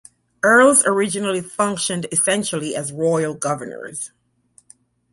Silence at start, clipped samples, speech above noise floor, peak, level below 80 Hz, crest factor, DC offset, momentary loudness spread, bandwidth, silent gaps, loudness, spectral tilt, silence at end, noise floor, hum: 0.45 s; under 0.1%; 38 dB; -2 dBFS; -62 dBFS; 18 dB; under 0.1%; 17 LU; 12 kHz; none; -18 LUFS; -3 dB/octave; 1.05 s; -57 dBFS; 60 Hz at -55 dBFS